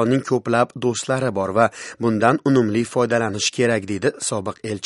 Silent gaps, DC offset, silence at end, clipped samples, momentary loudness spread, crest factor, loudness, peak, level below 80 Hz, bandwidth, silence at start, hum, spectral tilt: none; under 0.1%; 0 s; under 0.1%; 6 LU; 20 dB; -20 LUFS; 0 dBFS; -60 dBFS; 11.5 kHz; 0 s; none; -5 dB/octave